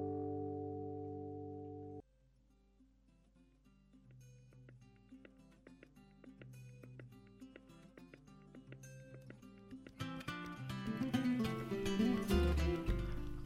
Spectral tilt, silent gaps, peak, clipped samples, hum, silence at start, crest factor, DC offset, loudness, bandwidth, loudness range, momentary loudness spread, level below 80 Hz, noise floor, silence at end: -6.5 dB/octave; none; -22 dBFS; under 0.1%; none; 0 s; 22 dB; under 0.1%; -41 LUFS; 16 kHz; 25 LU; 26 LU; -50 dBFS; -71 dBFS; 0 s